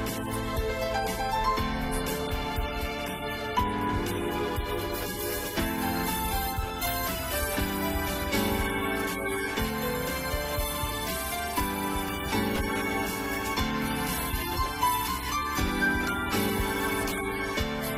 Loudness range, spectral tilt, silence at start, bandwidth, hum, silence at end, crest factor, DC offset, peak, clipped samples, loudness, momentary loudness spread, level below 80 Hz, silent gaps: 2 LU; -4 dB/octave; 0 s; 16 kHz; none; 0 s; 16 dB; under 0.1%; -14 dBFS; under 0.1%; -29 LUFS; 4 LU; -38 dBFS; none